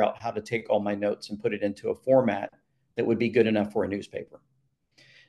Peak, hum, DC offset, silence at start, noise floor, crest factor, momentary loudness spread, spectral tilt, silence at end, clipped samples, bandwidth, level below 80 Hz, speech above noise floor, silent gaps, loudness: -8 dBFS; none; under 0.1%; 0 s; -72 dBFS; 18 dB; 15 LU; -7 dB/octave; 0.9 s; under 0.1%; 11.5 kHz; -68 dBFS; 45 dB; none; -27 LUFS